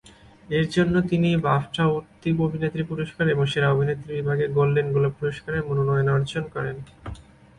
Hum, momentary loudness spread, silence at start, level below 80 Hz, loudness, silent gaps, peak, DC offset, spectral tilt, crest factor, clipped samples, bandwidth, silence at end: none; 9 LU; 0.5 s; -48 dBFS; -23 LUFS; none; -8 dBFS; under 0.1%; -7.5 dB/octave; 16 dB; under 0.1%; 11 kHz; 0.4 s